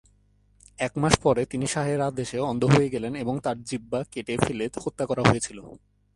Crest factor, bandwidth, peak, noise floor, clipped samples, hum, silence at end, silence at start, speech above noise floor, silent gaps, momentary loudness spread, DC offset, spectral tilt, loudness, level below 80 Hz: 26 dB; 11.5 kHz; 0 dBFS; -62 dBFS; under 0.1%; none; 0.4 s; 0.8 s; 37 dB; none; 10 LU; under 0.1%; -5.5 dB/octave; -26 LUFS; -50 dBFS